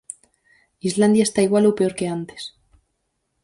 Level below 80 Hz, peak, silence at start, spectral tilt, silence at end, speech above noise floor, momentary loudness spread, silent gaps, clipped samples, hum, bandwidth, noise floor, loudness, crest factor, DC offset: -60 dBFS; -4 dBFS; 0.85 s; -5.5 dB/octave; 0.95 s; 55 dB; 19 LU; none; under 0.1%; none; 11.5 kHz; -73 dBFS; -19 LUFS; 16 dB; under 0.1%